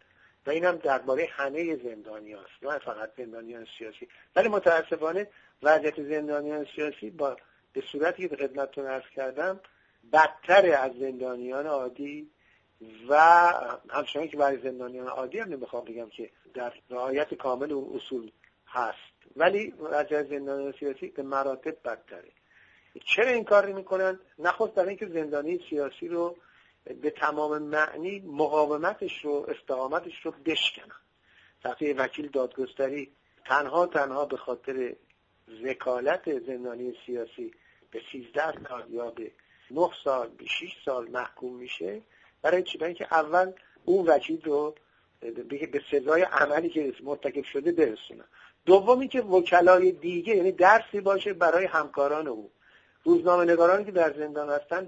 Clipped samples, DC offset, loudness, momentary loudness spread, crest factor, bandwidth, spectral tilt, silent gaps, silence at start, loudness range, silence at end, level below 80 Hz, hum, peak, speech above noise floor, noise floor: under 0.1%; under 0.1%; -27 LUFS; 18 LU; 24 dB; 7.8 kHz; -5 dB/octave; none; 0.45 s; 10 LU; 0 s; -72 dBFS; none; -4 dBFS; 35 dB; -62 dBFS